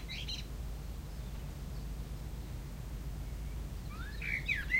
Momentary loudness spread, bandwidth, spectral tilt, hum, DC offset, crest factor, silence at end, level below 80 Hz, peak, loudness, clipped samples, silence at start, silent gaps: 9 LU; 16 kHz; -4.5 dB/octave; none; under 0.1%; 20 dB; 0 s; -42 dBFS; -20 dBFS; -42 LUFS; under 0.1%; 0 s; none